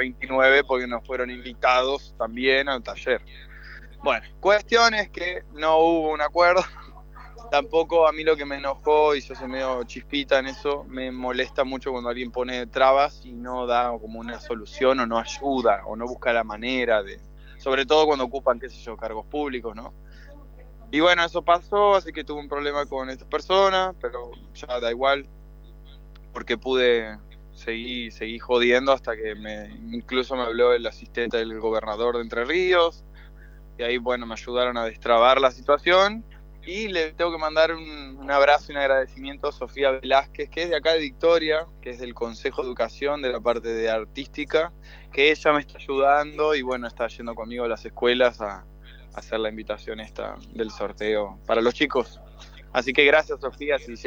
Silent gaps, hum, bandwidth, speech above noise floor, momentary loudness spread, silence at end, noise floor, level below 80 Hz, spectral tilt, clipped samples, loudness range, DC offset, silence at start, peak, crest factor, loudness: none; 50 Hz at -45 dBFS; 7.4 kHz; 21 dB; 15 LU; 0 s; -44 dBFS; -46 dBFS; -4 dB/octave; under 0.1%; 5 LU; under 0.1%; 0 s; -2 dBFS; 22 dB; -23 LUFS